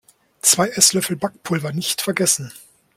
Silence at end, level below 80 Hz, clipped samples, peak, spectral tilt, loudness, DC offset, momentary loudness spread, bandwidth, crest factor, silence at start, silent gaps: 0.4 s; -62 dBFS; under 0.1%; 0 dBFS; -2.5 dB/octave; -18 LUFS; under 0.1%; 10 LU; 16.5 kHz; 20 dB; 0.45 s; none